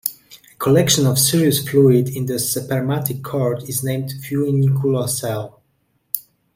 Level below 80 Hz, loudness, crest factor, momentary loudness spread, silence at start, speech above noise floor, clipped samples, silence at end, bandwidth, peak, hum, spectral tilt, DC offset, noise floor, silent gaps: -54 dBFS; -18 LUFS; 18 dB; 12 LU; 0.05 s; 48 dB; under 0.1%; 0.35 s; 16.5 kHz; 0 dBFS; none; -5 dB/octave; under 0.1%; -65 dBFS; none